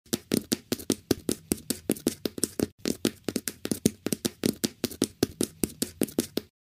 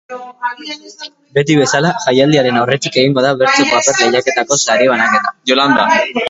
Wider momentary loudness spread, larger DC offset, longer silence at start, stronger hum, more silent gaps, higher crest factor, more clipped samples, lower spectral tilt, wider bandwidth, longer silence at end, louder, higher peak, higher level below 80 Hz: second, 3 LU vs 13 LU; neither; about the same, 0.15 s vs 0.1 s; neither; first, 2.72-2.78 s vs none; first, 28 dB vs 12 dB; neither; about the same, -4 dB/octave vs -3.5 dB/octave; first, 16 kHz vs 8 kHz; first, 0.15 s vs 0 s; second, -30 LUFS vs -12 LUFS; about the same, -2 dBFS vs 0 dBFS; about the same, -56 dBFS vs -56 dBFS